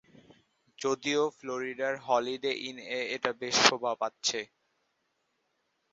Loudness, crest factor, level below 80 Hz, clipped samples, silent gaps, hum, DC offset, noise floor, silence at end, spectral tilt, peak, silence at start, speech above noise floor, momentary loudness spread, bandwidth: -30 LUFS; 32 dB; -76 dBFS; under 0.1%; none; none; under 0.1%; -78 dBFS; 1.45 s; -0.5 dB/octave; 0 dBFS; 0.8 s; 47 dB; 13 LU; 8 kHz